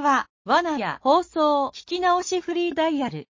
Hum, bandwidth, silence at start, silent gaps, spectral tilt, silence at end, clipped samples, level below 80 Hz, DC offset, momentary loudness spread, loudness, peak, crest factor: none; 7.6 kHz; 0 s; 0.30-0.45 s; -4 dB/octave; 0.1 s; under 0.1%; -60 dBFS; under 0.1%; 5 LU; -23 LUFS; -6 dBFS; 18 dB